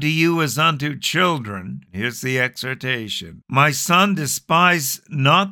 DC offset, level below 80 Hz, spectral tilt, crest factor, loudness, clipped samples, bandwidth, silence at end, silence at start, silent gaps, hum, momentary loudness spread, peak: under 0.1%; -60 dBFS; -4 dB/octave; 18 dB; -18 LUFS; under 0.1%; 19 kHz; 0 s; 0 s; none; none; 11 LU; -2 dBFS